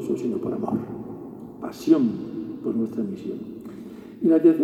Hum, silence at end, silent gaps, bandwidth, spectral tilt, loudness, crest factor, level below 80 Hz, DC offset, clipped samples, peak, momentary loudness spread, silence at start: none; 0 s; none; 12.5 kHz; -8 dB/octave; -25 LUFS; 18 dB; -62 dBFS; under 0.1%; under 0.1%; -6 dBFS; 18 LU; 0 s